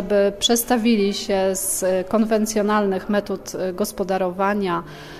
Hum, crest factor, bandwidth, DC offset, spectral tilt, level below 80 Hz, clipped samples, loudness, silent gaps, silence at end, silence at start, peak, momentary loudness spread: none; 14 dB; 16 kHz; under 0.1%; -4 dB/octave; -48 dBFS; under 0.1%; -21 LUFS; none; 0 s; 0 s; -6 dBFS; 7 LU